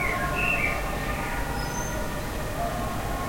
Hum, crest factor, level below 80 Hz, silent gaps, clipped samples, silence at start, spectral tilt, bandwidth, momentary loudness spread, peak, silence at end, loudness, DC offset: none; 14 dB; -34 dBFS; none; under 0.1%; 0 s; -4.5 dB/octave; 16.5 kHz; 7 LU; -12 dBFS; 0 s; -28 LUFS; under 0.1%